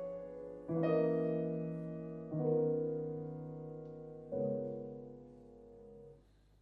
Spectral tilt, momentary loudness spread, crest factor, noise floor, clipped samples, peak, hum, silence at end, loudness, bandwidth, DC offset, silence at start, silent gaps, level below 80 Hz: -11 dB/octave; 23 LU; 18 dB; -64 dBFS; under 0.1%; -22 dBFS; none; 0.4 s; -39 LUFS; 4.7 kHz; under 0.1%; 0 s; none; -68 dBFS